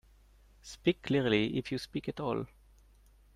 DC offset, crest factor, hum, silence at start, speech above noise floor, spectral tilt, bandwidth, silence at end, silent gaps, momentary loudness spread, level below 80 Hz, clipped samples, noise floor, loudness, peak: under 0.1%; 20 dB; none; 0.65 s; 29 dB; -6 dB/octave; 14 kHz; 0.9 s; none; 18 LU; -60 dBFS; under 0.1%; -61 dBFS; -33 LUFS; -14 dBFS